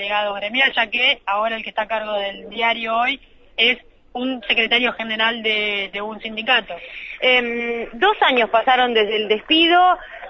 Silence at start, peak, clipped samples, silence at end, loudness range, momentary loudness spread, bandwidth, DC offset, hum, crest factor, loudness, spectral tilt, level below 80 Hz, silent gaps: 0 s; -2 dBFS; under 0.1%; 0 s; 3 LU; 11 LU; 6.6 kHz; under 0.1%; none; 16 dB; -18 LUFS; -4 dB/octave; -52 dBFS; none